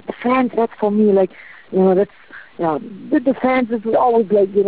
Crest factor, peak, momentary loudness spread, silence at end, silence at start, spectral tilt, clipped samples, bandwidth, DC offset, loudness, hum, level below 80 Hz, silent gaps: 12 dB; -6 dBFS; 9 LU; 0 s; 0.1 s; -11.5 dB/octave; under 0.1%; 4 kHz; 0.3%; -17 LUFS; none; -58 dBFS; none